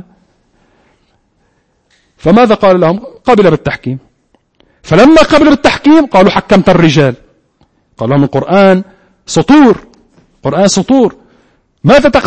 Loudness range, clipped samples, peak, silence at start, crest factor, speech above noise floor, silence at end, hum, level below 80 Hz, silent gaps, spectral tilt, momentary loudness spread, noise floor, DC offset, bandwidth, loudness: 4 LU; 1%; 0 dBFS; 2.25 s; 10 dB; 49 dB; 0 s; none; -36 dBFS; none; -6 dB/octave; 11 LU; -56 dBFS; under 0.1%; 9.4 kHz; -8 LUFS